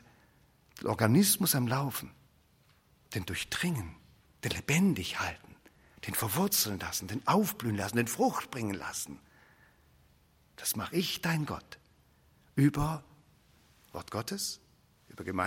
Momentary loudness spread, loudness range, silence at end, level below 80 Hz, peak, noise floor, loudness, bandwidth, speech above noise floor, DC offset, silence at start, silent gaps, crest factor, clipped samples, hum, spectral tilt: 16 LU; 5 LU; 0 s; -60 dBFS; -8 dBFS; -66 dBFS; -31 LUFS; 16.5 kHz; 35 dB; under 0.1%; 0.75 s; none; 24 dB; under 0.1%; none; -4 dB/octave